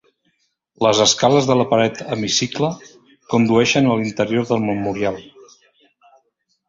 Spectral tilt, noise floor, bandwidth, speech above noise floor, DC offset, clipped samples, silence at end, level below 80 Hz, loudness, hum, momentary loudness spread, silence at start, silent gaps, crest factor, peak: -4 dB/octave; -67 dBFS; 7.8 kHz; 50 dB; under 0.1%; under 0.1%; 1.45 s; -54 dBFS; -17 LUFS; none; 10 LU; 0.8 s; none; 18 dB; 0 dBFS